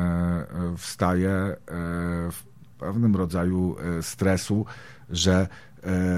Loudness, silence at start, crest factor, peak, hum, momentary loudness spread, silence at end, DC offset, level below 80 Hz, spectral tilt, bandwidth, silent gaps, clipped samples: -26 LUFS; 0 s; 18 dB; -8 dBFS; none; 11 LU; 0 s; 0.3%; -46 dBFS; -6 dB/octave; 15.5 kHz; none; under 0.1%